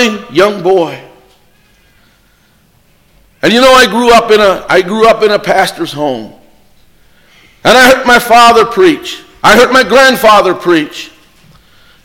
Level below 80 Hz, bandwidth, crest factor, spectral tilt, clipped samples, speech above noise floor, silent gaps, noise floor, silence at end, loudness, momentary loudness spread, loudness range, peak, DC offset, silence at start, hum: -40 dBFS; 17.5 kHz; 10 dB; -3.5 dB/octave; 0.5%; 42 dB; none; -49 dBFS; 0.95 s; -7 LUFS; 13 LU; 7 LU; 0 dBFS; under 0.1%; 0 s; none